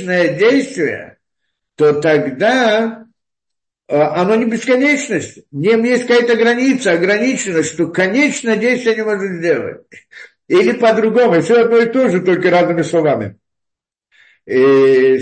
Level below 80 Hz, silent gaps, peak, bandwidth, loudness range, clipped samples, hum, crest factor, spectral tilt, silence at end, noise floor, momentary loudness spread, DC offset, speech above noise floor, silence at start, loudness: -62 dBFS; none; -2 dBFS; 8.8 kHz; 3 LU; under 0.1%; none; 12 dB; -5 dB/octave; 0 s; -83 dBFS; 8 LU; under 0.1%; 70 dB; 0 s; -13 LUFS